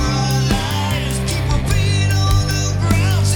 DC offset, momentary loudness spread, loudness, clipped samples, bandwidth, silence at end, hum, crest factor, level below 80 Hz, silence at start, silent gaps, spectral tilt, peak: under 0.1%; 4 LU; -17 LUFS; under 0.1%; 19 kHz; 0 s; none; 14 dB; -24 dBFS; 0 s; none; -5 dB/octave; -2 dBFS